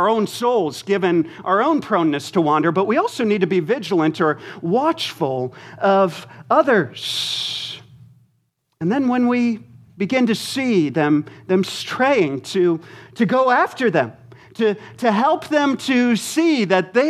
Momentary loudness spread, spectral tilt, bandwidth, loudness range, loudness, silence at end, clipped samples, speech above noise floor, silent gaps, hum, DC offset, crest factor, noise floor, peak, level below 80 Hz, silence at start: 7 LU; -5.5 dB/octave; 14.5 kHz; 3 LU; -19 LUFS; 0 s; under 0.1%; 49 dB; none; none; under 0.1%; 18 dB; -67 dBFS; -2 dBFS; -68 dBFS; 0 s